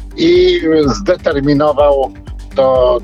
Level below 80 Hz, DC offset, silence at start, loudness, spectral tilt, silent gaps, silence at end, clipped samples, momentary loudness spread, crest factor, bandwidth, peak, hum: -28 dBFS; under 0.1%; 0 s; -12 LUFS; -6.5 dB/octave; none; 0 s; under 0.1%; 8 LU; 12 dB; 7.8 kHz; 0 dBFS; none